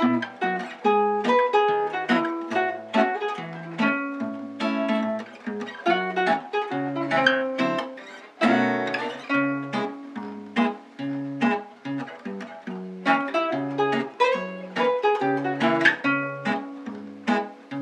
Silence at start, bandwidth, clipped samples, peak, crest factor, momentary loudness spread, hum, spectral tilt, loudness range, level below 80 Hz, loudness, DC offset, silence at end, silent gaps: 0 s; 9.8 kHz; under 0.1%; -4 dBFS; 22 dB; 13 LU; none; -5.5 dB/octave; 4 LU; -82 dBFS; -25 LUFS; under 0.1%; 0 s; none